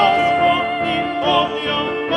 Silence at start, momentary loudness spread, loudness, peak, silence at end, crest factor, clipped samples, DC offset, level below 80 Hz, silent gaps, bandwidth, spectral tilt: 0 s; 5 LU; -17 LUFS; -2 dBFS; 0 s; 16 dB; under 0.1%; under 0.1%; -48 dBFS; none; 10.5 kHz; -5 dB/octave